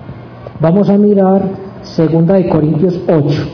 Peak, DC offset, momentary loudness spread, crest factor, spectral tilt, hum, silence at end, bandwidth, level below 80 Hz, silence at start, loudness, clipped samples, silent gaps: 0 dBFS; under 0.1%; 17 LU; 12 dB; -10 dB/octave; none; 0 s; 5.4 kHz; -42 dBFS; 0 s; -11 LUFS; under 0.1%; none